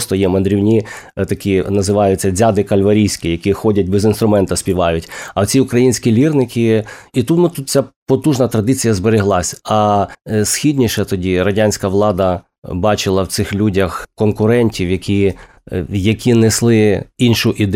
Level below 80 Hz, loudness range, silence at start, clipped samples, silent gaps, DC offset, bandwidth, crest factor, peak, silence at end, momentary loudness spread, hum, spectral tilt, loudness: -44 dBFS; 2 LU; 0 s; under 0.1%; 7.96-8.06 s, 12.58-12.62 s; under 0.1%; 16 kHz; 12 dB; -2 dBFS; 0 s; 6 LU; none; -5.5 dB/octave; -14 LUFS